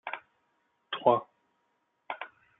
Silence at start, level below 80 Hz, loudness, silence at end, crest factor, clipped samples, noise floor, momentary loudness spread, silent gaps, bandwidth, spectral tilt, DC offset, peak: 0.05 s; -88 dBFS; -31 LUFS; 0.35 s; 26 dB; under 0.1%; -76 dBFS; 16 LU; none; 4 kHz; -2.5 dB/octave; under 0.1%; -8 dBFS